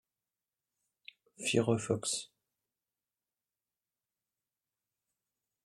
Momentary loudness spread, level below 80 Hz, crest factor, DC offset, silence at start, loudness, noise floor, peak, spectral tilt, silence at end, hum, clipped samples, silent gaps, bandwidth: 8 LU; -78 dBFS; 26 dB; under 0.1%; 1.4 s; -33 LUFS; under -90 dBFS; -14 dBFS; -4 dB/octave; 3.4 s; none; under 0.1%; none; 13 kHz